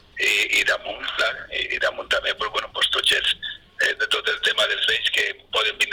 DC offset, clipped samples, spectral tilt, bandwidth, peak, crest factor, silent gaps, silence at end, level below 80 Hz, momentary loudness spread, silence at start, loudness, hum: under 0.1%; under 0.1%; 0.5 dB/octave; 19 kHz; -12 dBFS; 12 dB; none; 0 s; -54 dBFS; 7 LU; 0.15 s; -21 LUFS; none